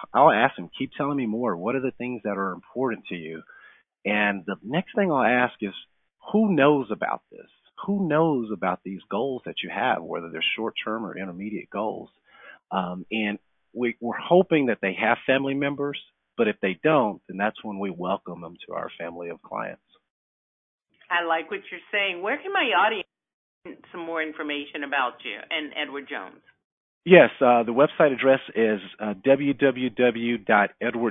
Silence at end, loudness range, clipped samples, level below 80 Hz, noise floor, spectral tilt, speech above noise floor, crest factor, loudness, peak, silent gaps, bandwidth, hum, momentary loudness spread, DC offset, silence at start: 0 s; 10 LU; under 0.1%; -68 dBFS; under -90 dBFS; -9 dB/octave; over 66 dB; 24 dB; -24 LUFS; -2 dBFS; 20.10-20.78 s, 23.34-23.62 s, 26.64-27.01 s; 3.9 kHz; none; 15 LU; under 0.1%; 0 s